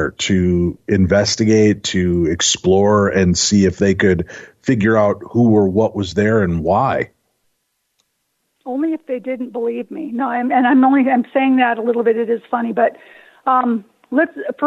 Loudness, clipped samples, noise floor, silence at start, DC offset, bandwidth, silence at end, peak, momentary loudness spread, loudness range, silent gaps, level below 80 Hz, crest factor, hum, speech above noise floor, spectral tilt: -16 LUFS; under 0.1%; -70 dBFS; 0 s; under 0.1%; 8 kHz; 0 s; -4 dBFS; 10 LU; 8 LU; none; -44 dBFS; 12 dB; none; 54 dB; -5 dB/octave